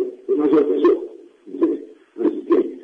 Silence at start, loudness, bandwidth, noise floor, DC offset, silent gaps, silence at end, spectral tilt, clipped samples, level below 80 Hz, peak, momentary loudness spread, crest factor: 0 s; -19 LUFS; 4.8 kHz; -38 dBFS; under 0.1%; none; 0 s; -8 dB/octave; under 0.1%; -68 dBFS; -6 dBFS; 18 LU; 14 dB